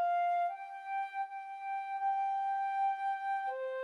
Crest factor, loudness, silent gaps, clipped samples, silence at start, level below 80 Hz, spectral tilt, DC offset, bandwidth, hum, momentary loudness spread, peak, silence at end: 8 dB; -36 LUFS; none; under 0.1%; 0 s; under -90 dBFS; 0.5 dB/octave; under 0.1%; 9.8 kHz; none; 8 LU; -26 dBFS; 0 s